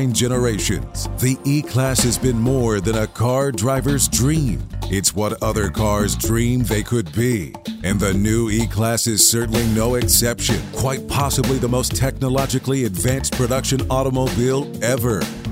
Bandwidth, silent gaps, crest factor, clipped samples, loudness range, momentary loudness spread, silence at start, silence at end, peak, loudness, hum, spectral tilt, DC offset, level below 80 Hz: 16.5 kHz; none; 18 dB; under 0.1%; 3 LU; 6 LU; 0 s; 0 s; 0 dBFS; -19 LUFS; none; -4.5 dB/octave; under 0.1%; -32 dBFS